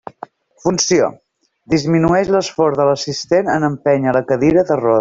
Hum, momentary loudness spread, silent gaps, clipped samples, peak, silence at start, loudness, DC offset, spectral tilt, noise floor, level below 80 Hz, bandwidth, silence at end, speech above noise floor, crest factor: none; 6 LU; none; under 0.1%; -2 dBFS; 0.65 s; -15 LUFS; under 0.1%; -5 dB/octave; -37 dBFS; -46 dBFS; 7.8 kHz; 0 s; 23 dB; 14 dB